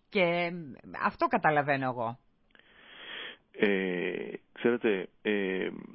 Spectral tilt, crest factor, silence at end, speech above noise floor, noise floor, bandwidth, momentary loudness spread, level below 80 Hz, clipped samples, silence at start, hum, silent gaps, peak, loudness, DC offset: -9.5 dB/octave; 20 dB; 0 s; 32 dB; -62 dBFS; 5.8 kHz; 16 LU; -70 dBFS; under 0.1%; 0.1 s; none; none; -12 dBFS; -30 LUFS; under 0.1%